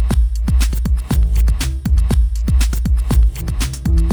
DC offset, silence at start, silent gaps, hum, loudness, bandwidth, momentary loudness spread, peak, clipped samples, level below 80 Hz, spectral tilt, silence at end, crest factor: under 0.1%; 0 s; none; none; -17 LUFS; over 20 kHz; 4 LU; -4 dBFS; under 0.1%; -14 dBFS; -6 dB/octave; 0 s; 10 dB